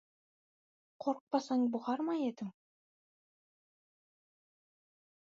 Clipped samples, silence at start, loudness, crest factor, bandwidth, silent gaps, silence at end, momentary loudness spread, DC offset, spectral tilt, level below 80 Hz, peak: under 0.1%; 1 s; -36 LUFS; 22 dB; 7.4 kHz; 1.21-1.27 s; 2.7 s; 9 LU; under 0.1%; -5 dB/octave; under -90 dBFS; -18 dBFS